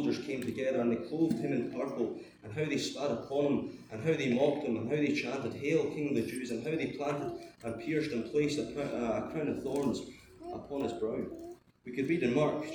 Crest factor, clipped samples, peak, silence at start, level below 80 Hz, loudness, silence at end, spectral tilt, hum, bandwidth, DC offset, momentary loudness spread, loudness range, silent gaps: 18 dB; under 0.1%; -16 dBFS; 0 s; -66 dBFS; -34 LUFS; 0 s; -6 dB/octave; none; over 20 kHz; under 0.1%; 12 LU; 3 LU; none